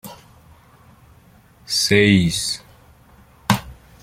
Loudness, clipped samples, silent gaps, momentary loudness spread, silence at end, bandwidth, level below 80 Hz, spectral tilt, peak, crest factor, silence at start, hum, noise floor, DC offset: -18 LUFS; under 0.1%; none; 16 LU; 0.3 s; 16.5 kHz; -48 dBFS; -4 dB/octave; 0 dBFS; 22 dB; 0.05 s; none; -50 dBFS; under 0.1%